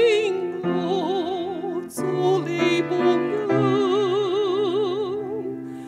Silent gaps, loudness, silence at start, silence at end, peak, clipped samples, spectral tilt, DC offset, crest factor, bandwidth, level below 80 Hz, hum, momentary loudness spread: none; -23 LUFS; 0 s; 0 s; -8 dBFS; under 0.1%; -6 dB/octave; under 0.1%; 14 dB; 13 kHz; -68 dBFS; none; 8 LU